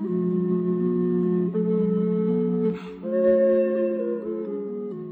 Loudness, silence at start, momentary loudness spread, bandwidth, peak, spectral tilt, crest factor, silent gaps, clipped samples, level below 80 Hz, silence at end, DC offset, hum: -24 LUFS; 0 s; 10 LU; 4.1 kHz; -10 dBFS; -12 dB/octave; 14 dB; none; under 0.1%; -64 dBFS; 0 s; under 0.1%; none